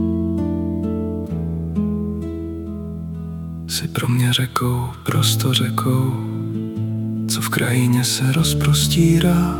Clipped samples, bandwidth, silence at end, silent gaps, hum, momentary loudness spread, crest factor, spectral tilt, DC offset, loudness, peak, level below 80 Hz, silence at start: under 0.1%; 18 kHz; 0 s; none; none; 13 LU; 18 dB; -5 dB/octave; under 0.1%; -20 LUFS; -2 dBFS; -40 dBFS; 0 s